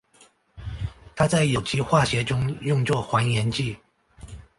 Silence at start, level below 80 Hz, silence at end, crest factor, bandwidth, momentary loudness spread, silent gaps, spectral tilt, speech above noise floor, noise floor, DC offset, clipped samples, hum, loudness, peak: 0.55 s; -44 dBFS; 0.2 s; 18 dB; 11.5 kHz; 18 LU; none; -5.5 dB/octave; 35 dB; -58 dBFS; under 0.1%; under 0.1%; none; -23 LUFS; -6 dBFS